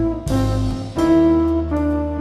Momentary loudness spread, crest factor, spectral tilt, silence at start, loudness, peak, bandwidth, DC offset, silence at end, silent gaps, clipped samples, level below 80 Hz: 7 LU; 12 dB; -8 dB/octave; 0 s; -18 LUFS; -6 dBFS; 13 kHz; under 0.1%; 0 s; none; under 0.1%; -28 dBFS